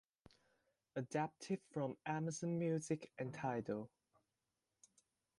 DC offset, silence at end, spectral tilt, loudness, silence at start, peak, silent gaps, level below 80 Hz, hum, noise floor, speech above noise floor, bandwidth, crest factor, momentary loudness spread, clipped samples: under 0.1%; 1.5 s; -6.5 dB/octave; -44 LUFS; 0.95 s; -28 dBFS; none; -82 dBFS; none; under -90 dBFS; over 47 dB; 11.5 kHz; 18 dB; 8 LU; under 0.1%